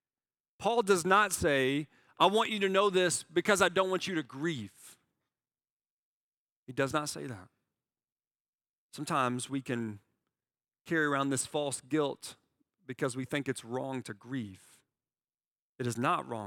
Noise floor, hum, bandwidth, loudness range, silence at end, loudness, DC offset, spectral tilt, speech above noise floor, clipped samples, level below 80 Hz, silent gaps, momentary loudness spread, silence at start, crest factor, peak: under -90 dBFS; none; 17 kHz; 12 LU; 0 s; -31 LUFS; under 0.1%; -4 dB/octave; over 59 dB; under 0.1%; -68 dBFS; 5.70-5.80 s, 5.90-6.66 s, 8.12-8.16 s, 8.27-8.31 s, 8.40-8.59 s, 8.69-8.89 s, 10.81-10.85 s, 15.51-15.76 s; 15 LU; 0.6 s; 24 dB; -8 dBFS